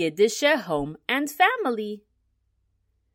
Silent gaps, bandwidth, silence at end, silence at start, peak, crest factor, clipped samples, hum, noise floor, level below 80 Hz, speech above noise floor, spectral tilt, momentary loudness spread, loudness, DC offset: none; 16.5 kHz; 1.15 s; 0 s; -6 dBFS; 20 dB; under 0.1%; none; -71 dBFS; -58 dBFS; 47 dB; -3.5 dB/octave; 11 LU; -23 LUFS; under 0.1%